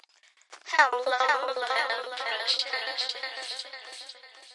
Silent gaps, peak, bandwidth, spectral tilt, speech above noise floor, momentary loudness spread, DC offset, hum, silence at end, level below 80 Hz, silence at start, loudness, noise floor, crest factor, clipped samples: none; -6 dBFS; 11.5 kHz; 3 dB/octave; 32 dB; 18 LU; under 0.1%; none; 0 s; under -90 dBFS; 0.5 s; -27 LUFS; -61 dBFS; 24 dB; under 0.1%